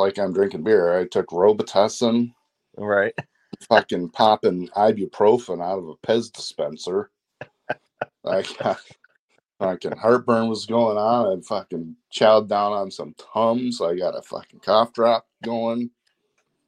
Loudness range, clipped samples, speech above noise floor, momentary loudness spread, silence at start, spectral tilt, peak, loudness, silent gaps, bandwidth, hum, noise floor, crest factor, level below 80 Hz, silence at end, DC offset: 6 LU; under 0.1%; 50 dB; 14 LU; 0 s; -5 dB/octave; -2 dBFS; -21 LUFS; 9.19-9.28 s; 11.5 kHz; none; -71 dBFS; 20 dB; -68 dBFS; 0.8 s; under 0.1%